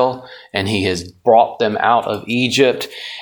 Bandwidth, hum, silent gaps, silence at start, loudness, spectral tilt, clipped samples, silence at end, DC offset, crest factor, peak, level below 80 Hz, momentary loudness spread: 19 kHz; none; none; 0 s; -16 LUFS; -4.5 dB/octave; under 0.1%; 0 s; under 0.1%; 16 dB; 0 dBFS; -54 dBFS; 11 LU